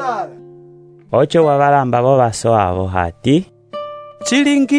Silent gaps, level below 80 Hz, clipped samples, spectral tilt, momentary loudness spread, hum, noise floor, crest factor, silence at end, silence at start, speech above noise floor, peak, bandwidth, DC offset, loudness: none; -46 dBFS; under 0.1%; -5.5 dB/octave; 16 LU; none; -42 dBFS; 14 dB; 0 s; 0 s; 29 dB; 0 dBFS; 11 kHz; under 0.1%; -15 LUFS